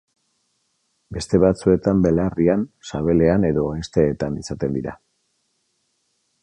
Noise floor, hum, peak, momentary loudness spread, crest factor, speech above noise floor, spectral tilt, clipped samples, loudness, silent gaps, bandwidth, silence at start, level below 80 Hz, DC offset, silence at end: -70 dBFS; none; -2 dBFS; 11 LU; 18 dB; 51 dB; -7.5 dB/octave; under 0.1%; -20 LUFS; none; 10.5 kHz; 1.1 s; -40 dBFS; under 0.1%; 1.45 s